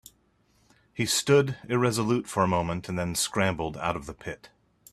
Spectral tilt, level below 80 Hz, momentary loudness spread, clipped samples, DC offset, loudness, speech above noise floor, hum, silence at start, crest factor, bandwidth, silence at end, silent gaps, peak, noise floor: -4.5 dB/octave; -56 dBFS; 16 LU; under 0.1%; under 0.1%; -26 LUFS; 40 dB; none; 0.95 s; 20 dB; 14.5 kHz; 0.45 s; none; -8 dBFS; -66 dBFS